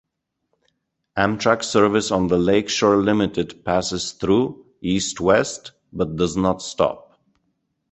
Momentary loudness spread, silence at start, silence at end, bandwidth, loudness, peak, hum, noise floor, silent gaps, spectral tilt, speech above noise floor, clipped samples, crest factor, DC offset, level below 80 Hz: 10 LU; 1.15 s; 0.9 s; 8.4 kHz; -20 LUFS; -2 dBFS; none; -74 dBFS; none; -4.5 dB/octave; 55 dB; under 0.1%; 20 dB; under 0.1%; -46 dBFS